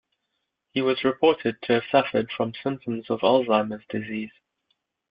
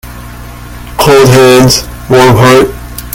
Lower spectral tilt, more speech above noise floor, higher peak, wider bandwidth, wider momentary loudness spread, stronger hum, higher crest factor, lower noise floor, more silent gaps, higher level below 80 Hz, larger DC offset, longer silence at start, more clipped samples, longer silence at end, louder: first, -9.5 dB/octave vs -5 dB/octave; first, 55 dB vs 21 dB; second, -4 dBFS vs 0 dBFS; second, 5.2 kHz vs 18.5 kHz; second, 11 LU vs 23 LU; second, none vs 60 Hz at -25 dBFS; first, 20 dB vs 6 dB; first, -79 dBFS vs -24 dBFS; neither; second, -66 dBFS vs -26 dBFS; neither; first, 0.75 s vs 0.05 s; second, under 0.1% vs 5%; first, 0.8 s vs 0 s; second, -24 LUFS vs -5 LUFS